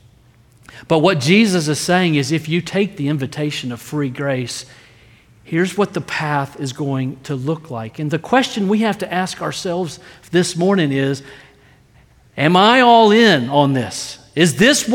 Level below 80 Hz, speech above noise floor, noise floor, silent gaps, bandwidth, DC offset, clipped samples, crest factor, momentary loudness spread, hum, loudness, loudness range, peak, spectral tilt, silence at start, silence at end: -56 dBFS; 34 dB; -50 dBFS; none; 17.5 kHz; under 0.1%; under 0.1%; 16 dB; 14 LU; none; -17 LUFS; 8 LU; 0 dBFS; -5 dB/octave; 0.75 s; 0 s